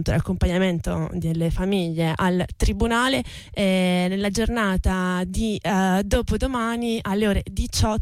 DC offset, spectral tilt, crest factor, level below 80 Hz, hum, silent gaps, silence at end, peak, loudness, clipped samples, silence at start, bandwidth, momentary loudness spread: under 0.1%; -5.5 dB/octave; 12 dB; -30 dBFS; none; none; 0 s; -10 dBFS; -23 LUFS; under 0.1%; 0 s; 15 kHz; 5 LU